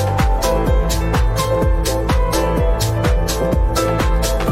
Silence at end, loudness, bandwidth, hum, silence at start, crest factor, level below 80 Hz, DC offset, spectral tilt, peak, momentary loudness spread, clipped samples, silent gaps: 0 s; -17 LUFS; 16 kHz; none; 0 s; 12 dB; -18 dBFS; under 0.1%; -5.5 dB/octave; -4 dBFS; 1 LU; under 0.1%; none